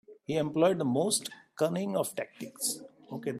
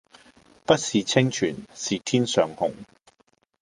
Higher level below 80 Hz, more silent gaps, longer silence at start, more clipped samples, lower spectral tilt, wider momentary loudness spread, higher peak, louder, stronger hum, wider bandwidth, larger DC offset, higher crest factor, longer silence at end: second, -74 dBFS vs -60 dBFS; neither; second, 0.1 s vs 0.7 s; neither; about the same, -4.5 dB/octave vs -4.5 dB/octave; first, 14 LU vs 10 LU; second, -14 dBFS vs -2 dBFS; second, -31 LUFS vs -24 LUFS; neither; first, 15.5 kHz vs 11.5 kHz; neither; second, 18 dB vs 24 dB; second, 0 s vs 0.75 s